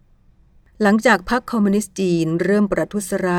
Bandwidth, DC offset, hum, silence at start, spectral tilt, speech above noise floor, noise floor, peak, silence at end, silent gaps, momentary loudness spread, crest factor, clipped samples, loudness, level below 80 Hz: 16 kHz; under 0.1%; none; 0.8 s; -5.5 dB/octave; 35 dB; -53 dBFS; -2 dBFS; 0 s; none; 6 LU; 16 dB; under 0.1%; -18 LUFS; -46 dBFS